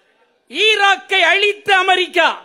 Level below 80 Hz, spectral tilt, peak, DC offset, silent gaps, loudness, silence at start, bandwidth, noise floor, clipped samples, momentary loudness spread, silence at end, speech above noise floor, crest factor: -68 dBFS; -0.5 dB/octave; -2 dBFS; under 0.1%; none; -13 LUFS; 0.5 s; 15.5 kHz; -58 dBFS; under 0.1%; 4 LU; 0.05 s; 44 dB; 14 dB